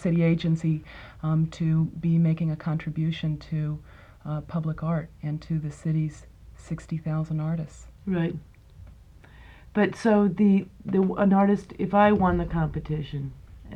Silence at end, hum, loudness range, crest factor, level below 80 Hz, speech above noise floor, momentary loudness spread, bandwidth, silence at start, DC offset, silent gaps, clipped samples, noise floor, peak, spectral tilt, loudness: 0 s; none; 9 LU; 20 dB; -46 dBFS; 25 dB; 13 LU; 8.2 kHz; 0 s; under 0.1%; none; under 0.1%; -49 dBFS; -6 dBFS; -8.5 dB/octave; -26 LUFS